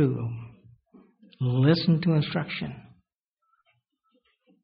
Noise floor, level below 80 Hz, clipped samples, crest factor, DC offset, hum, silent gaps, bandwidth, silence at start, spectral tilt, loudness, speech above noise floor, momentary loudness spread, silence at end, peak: -79 dBFS; -62 dBFS; under 0.1%; 20 dB; under 0.1%; none; none; 5.2 kHz; 0 s; -6.5 dB/octave; -26 LUFS; 55 dB; 19 LU; 1.8 s; -8 dBFS